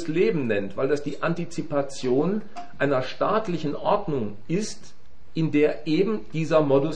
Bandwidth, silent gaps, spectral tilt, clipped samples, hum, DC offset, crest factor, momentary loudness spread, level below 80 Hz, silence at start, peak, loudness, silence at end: 9.6 kHz; none; -6.5 dB/octave; under 0.1%; none; 3%; 18 dB; 8 LU; -56 dBFS; 0 s; -6 dBFS; -25 LUFS; 0 s